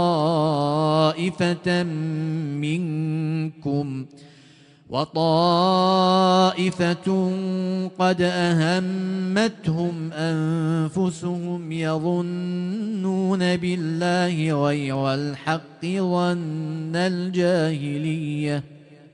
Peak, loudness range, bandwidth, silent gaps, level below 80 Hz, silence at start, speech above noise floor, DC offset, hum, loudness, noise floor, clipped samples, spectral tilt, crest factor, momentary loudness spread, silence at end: -6 dBFS; 5 LU; 10.5 kHz; none; -62 dBFS; 0 s; 29 dB; under 0.1%; none; -23 LUFS; -51 dBFS; under 0.1%; -6.5 dB/octave; 16 dB; 9 LU; 0.2 s